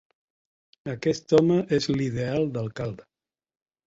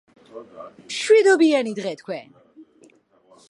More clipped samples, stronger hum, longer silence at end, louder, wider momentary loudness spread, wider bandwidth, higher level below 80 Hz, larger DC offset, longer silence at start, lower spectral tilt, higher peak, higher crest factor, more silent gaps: neither; neither; about the same, 0.85 s vs 0.85 s; second, -25 LUFS vs -19 LUFS; second, 15 LU vs 26 LU; second, 8 kHz vs 11 kHz; first, -56 dBFS vs -78 dBFS; neither; first, 0.85 s vs 0.35 s; first, -6.5 dB/octave vs -3.5 dB/octave; about the same, -6 dBFS vs -4 dBFS; about the same, 20 dB vs 18 dB; neither